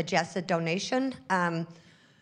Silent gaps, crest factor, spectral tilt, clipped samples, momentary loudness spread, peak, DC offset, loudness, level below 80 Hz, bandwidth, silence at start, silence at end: none; 20 dB; -5 dB/octave; under 0.1%; 5 LU; -10 dBFS; under 0.1%; -29 LUFS; -74 dBFS; 10 kHz; 0 s; 0.45 s